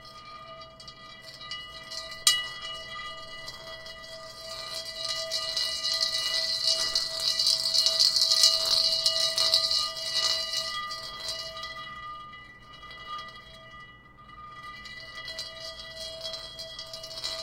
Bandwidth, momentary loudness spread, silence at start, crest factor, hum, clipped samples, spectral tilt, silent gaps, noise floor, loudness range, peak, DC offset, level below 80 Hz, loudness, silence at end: 17 kHz; 23 LU; 0 s; 28 dB; none; under 0.1%; 1 dB/octave; none; -50 dBFS; 19 LU; -4 dBFS; under 0.1%; -60 dBFS; -25 LUFS; 0 s